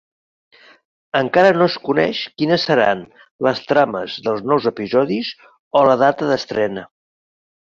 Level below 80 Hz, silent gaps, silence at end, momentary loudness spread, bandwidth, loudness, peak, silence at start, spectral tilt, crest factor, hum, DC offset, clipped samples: -60 dBFS; 3.31-3.39 s, 5.59-5.71 s; 0.85 s; 9 LU; 7.4 kHz; -17 LUFS; -2 dBFS; 1.15 s; -6 dB/octave; 16 dB; none; under 0.1%; under 0.1%